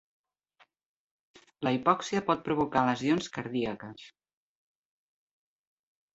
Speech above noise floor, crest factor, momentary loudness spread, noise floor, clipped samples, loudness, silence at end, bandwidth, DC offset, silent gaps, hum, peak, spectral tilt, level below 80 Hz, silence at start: 38 dB; 24 dB; 11 LU; -67 dBFS; under 0.1%; -29 LUFS; 2.05 s; 8 kHz; under 0.1%; none; none; -8 dBFS; -5.5 dB/octave; -66 dBFS; 1.6 s